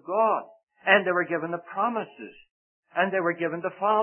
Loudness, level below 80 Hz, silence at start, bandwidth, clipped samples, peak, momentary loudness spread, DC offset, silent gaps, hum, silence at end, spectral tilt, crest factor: -26 LUFS; -80 dBFS; 0.05 s; 3.4 kHz; under 0.1%; -2 dBFS; 12 LU; under 0.1%; 0.63-0.67 s, 2.51-2.83 s; none; 0 s; -9 dB/octave; 24 dB